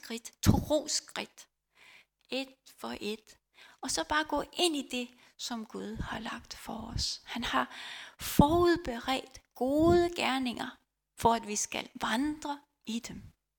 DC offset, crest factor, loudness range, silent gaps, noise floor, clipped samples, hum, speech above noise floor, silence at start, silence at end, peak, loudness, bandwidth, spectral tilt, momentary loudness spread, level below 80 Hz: under 0.1%; 26 dB; 7 LU; none; -60 dBFS; under 0.1%; none; 28 dB; 0.05 s; 0.3 s; -8 dBFS; -32 LUFS; 19 kHz; -4 dB/octave; 15 LU; -50 dBFS